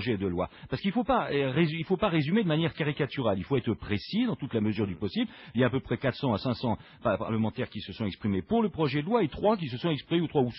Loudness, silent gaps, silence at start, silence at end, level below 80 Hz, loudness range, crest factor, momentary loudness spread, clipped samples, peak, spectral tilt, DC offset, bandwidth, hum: -29 LUFS; none; 0 s; 0 s; -54 dBFS; 2 LU; 16 dB; 6 LU; under 0.1%; -12 dBFS; -5.5 dB/octave; under 0.1%; 5.8 kHz; none